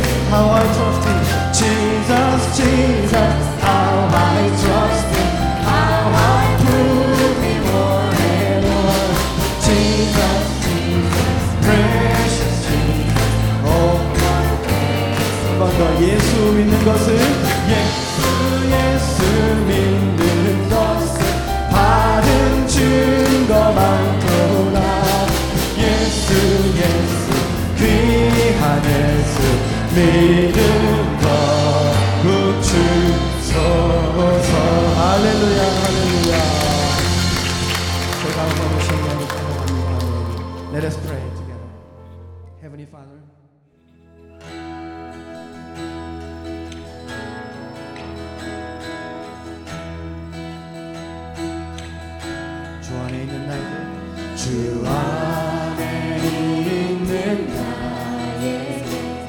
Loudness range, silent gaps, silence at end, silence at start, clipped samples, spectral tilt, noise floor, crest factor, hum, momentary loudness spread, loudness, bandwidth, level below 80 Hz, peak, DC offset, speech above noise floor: 16 LU; none; 0 s; 0 s; under 0.1%; -5.5 dB/octave; -54 dBFS; 16 dB; none; 17 LU; -16 LUFS; 19 kHz; -26 dBFS; 0 dBFS; under 0.1%; 41 dB